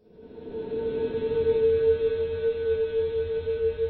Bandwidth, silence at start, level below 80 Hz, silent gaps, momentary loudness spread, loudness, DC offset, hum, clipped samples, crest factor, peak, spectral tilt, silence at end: 4.4 kHz; 0.2 s; -48 dBFS; none; 10 LU; -26 LUFS; under 0.1%; none; under 0.1%; 12 dB; -14 dBFS; -10 dB/octave; 0 s